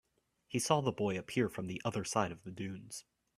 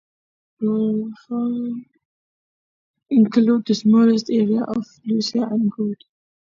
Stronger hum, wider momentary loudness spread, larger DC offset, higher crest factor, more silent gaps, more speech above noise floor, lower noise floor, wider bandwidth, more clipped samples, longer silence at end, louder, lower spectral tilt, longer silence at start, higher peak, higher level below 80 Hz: neither; about the same, 13 LU vs 12 LU; neither; first, 24 dB vs 16 dB; second, none vs 2.05-2.94 s; second, 32 dB vs over 71 dB; second, -68 dBFS vs under -90 dBFS; first, 15.5 kHz vs 7.4 kHz; neither; second, 0.35 s vs 0.55 s; second, -36 LUFS vs -20 LUFS; second, -4.5 dB/octave vs -7 dB/octave; about the same, 0.5 s vs 0.6 s; second, -14 dBFS vs -4 dBFS; about the same, -70 dBFS vs -66 dBFS